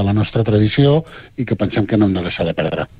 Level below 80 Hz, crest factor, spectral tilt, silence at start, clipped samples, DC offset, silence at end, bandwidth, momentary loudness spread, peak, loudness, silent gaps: -40 dBFS; 14 dB; -10 dB/octave; 0 s; under 0.1%; under 0.1%; 0.15 s; 4.9 kHz; 8 LU; -2 dBFS; -17 LUFS; none